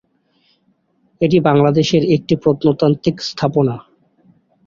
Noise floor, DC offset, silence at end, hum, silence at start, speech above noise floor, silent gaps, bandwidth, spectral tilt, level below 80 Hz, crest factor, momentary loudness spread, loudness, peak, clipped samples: -61 dBFS; under 0.1%; 0.85 s; none; 1.2 s; 47 dB; none; 7.4 kHz; -7 dB/octave; -50 dBFS; 16 dB; 7 LU; -15 LUFS; -2 dBFS; under 0.1%